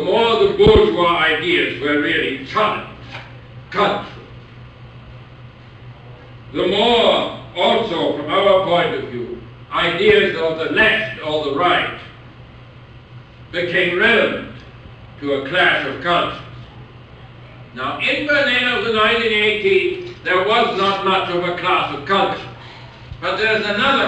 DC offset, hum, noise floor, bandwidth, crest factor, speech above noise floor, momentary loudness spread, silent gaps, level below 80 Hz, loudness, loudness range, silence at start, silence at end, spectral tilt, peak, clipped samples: under 0.1%; none; -40 dBFS; 9 kHz; 18 dB; 24 dB; 19 LU; none; -42 dBFS; -16 LUFS; 5 LU; 0 s; 0 s; -5.5 dB/octave; 0 dBFS; under 0.1%